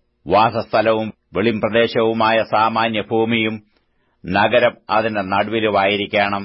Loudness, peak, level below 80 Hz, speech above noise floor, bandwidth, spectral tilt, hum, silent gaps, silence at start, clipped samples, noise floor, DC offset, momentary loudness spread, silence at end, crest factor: -17 LUFS; -4 dBFS; -52 dBFS; 45 dB; 5.8 kHz; -10.5 dB/octave; none; none; 0.25 s; under 0.1%; -62 dBFS; under 0.1%; 5 LU; 0 s; 14 dB